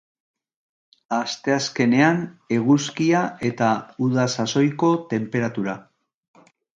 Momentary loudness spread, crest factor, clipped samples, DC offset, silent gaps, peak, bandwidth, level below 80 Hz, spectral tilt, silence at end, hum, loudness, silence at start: 8 LU; 20 dB; under 0.1%; under 0.1%; none; -2 dBFS; 8.8 kHz; -64 dBFS; -5.5 dB/octave; 0.95 s; none; -21 LUFS; 1.1 s